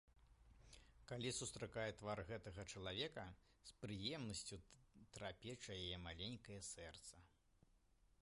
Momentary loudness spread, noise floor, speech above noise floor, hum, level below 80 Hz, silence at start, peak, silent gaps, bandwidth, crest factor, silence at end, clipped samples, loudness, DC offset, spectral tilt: 17 LU; -76 dBFS; 25 dB; none; -68 dBFS; 0.05 s; -32 dBFS; none; 11.5 kHz; 20 dB; 0.45 s; under 0.1%; -51 LUFS; under 0.1%; -3.5 dB/octave